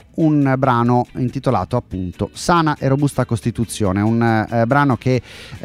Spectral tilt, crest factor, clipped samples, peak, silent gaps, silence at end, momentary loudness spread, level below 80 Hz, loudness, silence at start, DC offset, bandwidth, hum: -7 dB/octave; 16 dB; under 0.1%; -2 dBFS; none; 0.05 s; 7 LU; -44 dBFS; -18 LUFS; 0.15 s; under 0.1%; 14.5 kHz; none